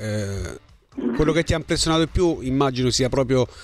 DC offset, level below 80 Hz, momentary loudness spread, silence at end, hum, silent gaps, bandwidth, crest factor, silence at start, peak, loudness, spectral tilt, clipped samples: under 0.1%; -36 dBFS; 10 LU; 0 s; none; none; 14 kHz; 16 dB; 0 s; -6 dBFS; -22 LUFS; -5 dB/octave; under 0.1%